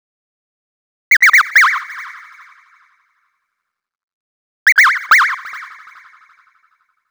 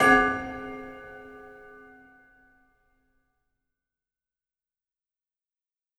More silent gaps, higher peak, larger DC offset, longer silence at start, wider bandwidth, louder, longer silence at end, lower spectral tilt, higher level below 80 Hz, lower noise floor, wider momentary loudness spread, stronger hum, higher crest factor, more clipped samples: first, 4.03-4.66 s vs none; first, 0 dBFS vs -6 dBFS; neither; first, 1.1 s vs 0 s; first, over 20 kHz vs 12 kHz; first, -10 LUFS vs -25 LUFS; second, 1.45 s vs 4.5 s; second, 5 dB/octave vs -4 dB/octave; second, -78 dBFS vs -56 dBFS; second, -77 dBFS vs -90 dBFS; second, 22 LU vs 28 LU; neither; second, 16 dB vs 26 dB; neither